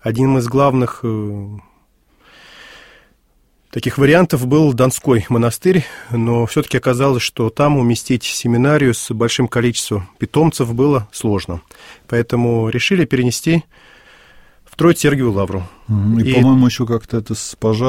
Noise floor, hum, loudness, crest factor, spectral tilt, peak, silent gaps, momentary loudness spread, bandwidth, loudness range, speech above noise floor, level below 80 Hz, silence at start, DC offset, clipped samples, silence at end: -57 dBFS; none; -16 LUFS; 16 dB; -6 dB/octave; 0 dBFS; none; 10 LU; 16.5 kHz; 4 LU; 42 dB; -44 dBFS; 0.05 s; 0.2%; under 0.1%; 0 s